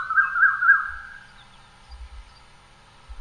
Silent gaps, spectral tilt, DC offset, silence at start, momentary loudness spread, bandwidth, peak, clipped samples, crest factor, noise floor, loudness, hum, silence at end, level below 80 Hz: none; -2.5 dB/octave; under 0.1%; 0 s; 21 LU; 10.5 kHz; -6 dBFS; under 0.1%; 20 dB; -51 dBFS; -19 LUFS; none; 0 s; -48 dBFS